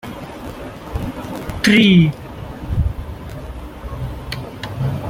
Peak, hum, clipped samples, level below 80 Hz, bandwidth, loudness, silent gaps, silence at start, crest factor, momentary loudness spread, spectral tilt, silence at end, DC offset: -2 dBFS; none; under 0.1%; -32 dBFS; 16 kHz; -18 LUFS; none; 0.05 s; 18 dB; 20 LU; -6 dB/octave; 0 s; under 0.1%